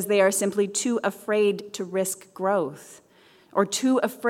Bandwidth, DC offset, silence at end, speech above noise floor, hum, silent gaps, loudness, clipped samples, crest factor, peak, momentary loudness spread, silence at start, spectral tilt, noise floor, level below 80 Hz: 16.5 kHz; under 0.1%; 0 s; 31 dB; none; none; -25 LUFS; under 0.1%; 18 dB; -6 dBFS; 9 LU; 0 s; -3.5 dB/octave; -55 dBFS; -76 dBFS